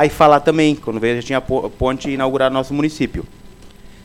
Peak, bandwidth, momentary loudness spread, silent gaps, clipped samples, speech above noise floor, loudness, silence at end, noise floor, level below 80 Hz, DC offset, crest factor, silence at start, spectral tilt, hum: 0 dBFS; 16 kHz; 10 LU; none; 0.1%; 23 dB; -17 LUFS; 0.15 s; -39 dBFS; -38 dBFS; under 0.1%; 18 dB; 0 s; -6 dB/octave; none